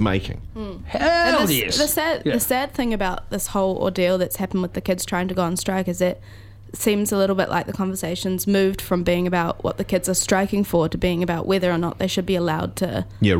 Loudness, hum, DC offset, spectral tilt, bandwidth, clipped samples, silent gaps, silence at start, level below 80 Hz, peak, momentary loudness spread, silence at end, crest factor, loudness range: -21 LUFS; none; under 0.1%; -4.5 dB/octave; 17 kHz; under 0.1%; none; 0 s; -40 dBFS; -4 dBFS; 7 LU; 0 s; 18 dB; 2 LU